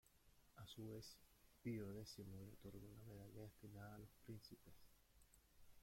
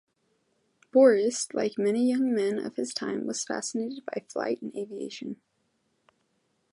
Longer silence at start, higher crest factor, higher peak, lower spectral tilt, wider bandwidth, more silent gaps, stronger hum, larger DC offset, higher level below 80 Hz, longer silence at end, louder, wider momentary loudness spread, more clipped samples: second, 0.05 s vs 0.95 s; about the same, 20 dB vs 20 dB; second, -38 dBFS vs -8 dBFS; first, -6 dB/octave vs -4 dB/octave; first, 16.5 kHz vs 11.5 kHz; neither; neither; neither; first, -74 dBFS vs -80 dBFS; second, 0 s vs 1.35 s; second, -58 LUFS vs -27 LUFS; second, 10 LU vs 16 LU; neither